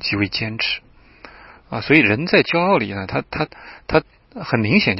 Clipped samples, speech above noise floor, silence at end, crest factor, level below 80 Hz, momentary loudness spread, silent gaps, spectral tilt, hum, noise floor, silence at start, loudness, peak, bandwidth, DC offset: under 0.1%; 26 dB; 0 s; 20 dB; -46 dBFS; 14 LU; none; -8.5 dB/octave; none; -45 dBFS; 0 s; -18 LUFS; 0 dBFS; 6 kHz; under 0.1%